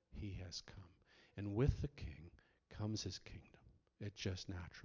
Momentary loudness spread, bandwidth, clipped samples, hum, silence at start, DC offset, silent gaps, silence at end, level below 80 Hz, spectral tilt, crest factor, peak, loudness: 21 LU; 7.6 kHz; under 0.1%; none; 0.1 s; under 0.1%; none; 0 s; -54 dBFS; -6 dB/octave; 24 dB; -22 dBFS; -46 LUFS